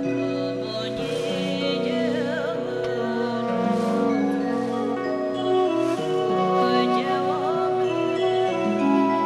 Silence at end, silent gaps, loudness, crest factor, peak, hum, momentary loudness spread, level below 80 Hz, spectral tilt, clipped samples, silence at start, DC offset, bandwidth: 0 s; none; -23 LUFS; 14 dB; -8 dBFS; none; 6 LU; -64 dBFS; -6 dB/octave; under 0.1%; 0 s; under 0.1%; 12 kHz